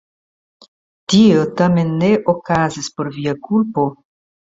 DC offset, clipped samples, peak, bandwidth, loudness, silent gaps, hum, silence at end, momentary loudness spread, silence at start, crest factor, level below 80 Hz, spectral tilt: under 0.1%; under 0.1%; -2 dBFS; 7.8 kHz; -16 LUFS; none; none; 0.6 s; 11 LU; 1.1 s; 16 dB; -50 dBFS; -6 dB/octave